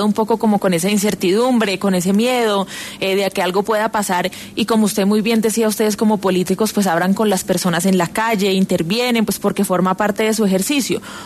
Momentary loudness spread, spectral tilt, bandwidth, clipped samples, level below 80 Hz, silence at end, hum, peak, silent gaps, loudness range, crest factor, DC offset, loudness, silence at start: 3 LU; -4.5 dB/octave; 14 kHz; under 0.1%; -54 dBFS; 0 s; none; -4 dBFS; none; 1 LU; 12 dB; under 0.1%; -17 LUFS; 0 s